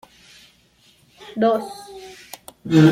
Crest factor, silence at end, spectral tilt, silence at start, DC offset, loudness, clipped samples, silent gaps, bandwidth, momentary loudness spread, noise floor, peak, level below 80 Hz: 20 dB; 0 s; -7 dB/octave; 1.3 s; under 0.1%; -19 LUFS; under 0.1%; none; 16 kHz; 21 LU; -56 dBFS; -2 dBFS; -60 dBFS